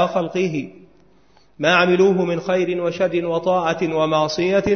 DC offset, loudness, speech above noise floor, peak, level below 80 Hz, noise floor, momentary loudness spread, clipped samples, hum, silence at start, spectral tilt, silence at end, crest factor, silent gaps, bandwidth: 0.2%; -19 LUFS; 38 dB; -2 dBFS; -54 dBFS; -56 dBFS; 7 LU; under 0.1%; none; 0 s; -5.5 dB/octave; 0 s; 18 dB; none; 6.6 kHz